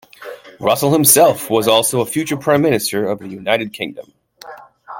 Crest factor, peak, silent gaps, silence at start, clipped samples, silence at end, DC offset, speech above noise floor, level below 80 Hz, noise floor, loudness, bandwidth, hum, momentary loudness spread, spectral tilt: 16 dB; 0 dBFS; none; 0.2 s; under 0.1%; 0 s; under 0.1%; 23 dB; -56 dBFS; -38 dBFS; -15 LUFS; 17 kHz; none; 17 LU; -3.5 dB/octave